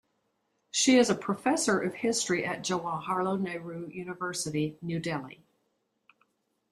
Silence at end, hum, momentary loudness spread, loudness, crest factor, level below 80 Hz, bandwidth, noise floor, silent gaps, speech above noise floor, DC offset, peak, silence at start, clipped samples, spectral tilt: 1.35 s; none; 14 LU; -29 LUFS; 20 dB; -70 dBFS; 14.5 kHz; -77 dBFS; none; 48 dB; under 0.1%; -12 dBFS; 0.75 s; under 0.1%; -3.5 dB/octave